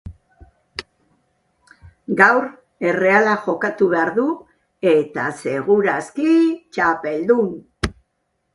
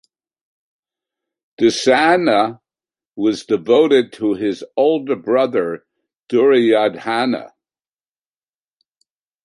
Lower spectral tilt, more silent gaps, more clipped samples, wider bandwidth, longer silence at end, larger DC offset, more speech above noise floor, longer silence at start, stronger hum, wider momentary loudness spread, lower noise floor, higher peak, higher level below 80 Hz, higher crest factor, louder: first, -6 dB/octave vs -4.5 dB/octave; second, none vs 3.06-3.12 s, 6.16-6.23 s; neither; about the same, 11.5 kHz vs 11.5 kHz; second, 0.65 s vs 2 s; neither; second, 54 dB vs over 75 dB; second, 0.05 s vs 1.6 s; neither; first, 15 LU vs 9 LU; second, -71 dBFS vs under -90 dBFS; about the same, 0 dBFS vs -2 dBFS; first, -46 dBFS vs -66 dBFS; about the same, 20 dB vs 16 dB; about the same, -18 LUFS vs -16 LUFS